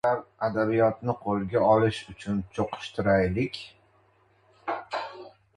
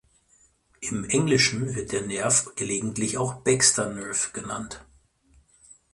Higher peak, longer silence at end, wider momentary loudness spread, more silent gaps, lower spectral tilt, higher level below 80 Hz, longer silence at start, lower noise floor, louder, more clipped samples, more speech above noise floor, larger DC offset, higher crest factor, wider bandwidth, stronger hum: about the same, -8 dBFS vs -6 dBFS; second, 0.3 s vs 1.1 s; about the same, 15 LU vs 14 LU; neither; first, -7 dB/octave vs -3 dB/octave; about the same, -52 dBFS vs -56 dBFS; second, 0.05 s vs 0.8 s; about the same, -63 dBFS vs -62 dBFS; second, -27 LUFS vs -24 LUFS; neither; about the same, 37 dB vs 37 dB; neither; about the same, 20 dB vs 22 dB; about the same, 11 kHz vs 11.5 kHz; neither